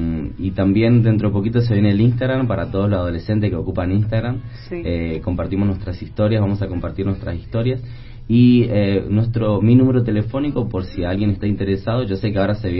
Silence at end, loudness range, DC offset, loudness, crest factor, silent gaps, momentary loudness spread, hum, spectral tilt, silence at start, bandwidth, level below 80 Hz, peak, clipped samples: 0 s; 5 LU; under 0.1%; -19 LUFS; 16 dB; none; 10 LU; none; -13 dB/octave; 0 s; 5.8 kHz; -36 dBFS; -2 dBFS; under 0.1%